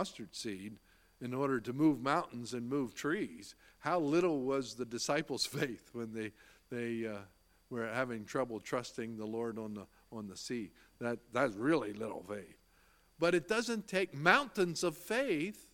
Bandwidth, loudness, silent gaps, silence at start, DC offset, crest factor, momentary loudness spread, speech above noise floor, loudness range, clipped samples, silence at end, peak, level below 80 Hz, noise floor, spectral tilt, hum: 17 kHz; -36 LUFS; none; 0 s; under 0.1%; 28 dB; 15 LU; 32 dB; 6 LU; under 0.1%; 0.1 s; -10 dBFS; -72 dBFS; -68 dBFS; -4.5 dB/octave; none